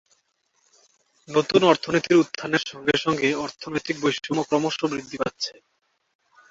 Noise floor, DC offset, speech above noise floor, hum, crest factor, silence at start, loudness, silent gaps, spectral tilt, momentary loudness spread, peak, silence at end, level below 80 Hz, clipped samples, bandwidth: -69 dBFS; under 0.1%; 46 dB; none; 22 dB; 1.3 s; -23 LUFS; none; -4.5 dB/octave; 11 LU; -2 dBFS; 1 s; -62 dBFS; under 0.1%; 7.8 kHz